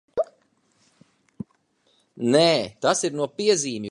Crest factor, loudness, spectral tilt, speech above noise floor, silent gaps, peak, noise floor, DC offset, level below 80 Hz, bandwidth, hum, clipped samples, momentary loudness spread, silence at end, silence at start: 20 dB; -22 LUFS; -3.5 dB/octave; 45 dB; none; -6 dBFS; -66 dBFS; under 0.1%; -66 dBFS; 11.5 kHz; none; under 0.1%; 23 LU; 0 s; 0.15 s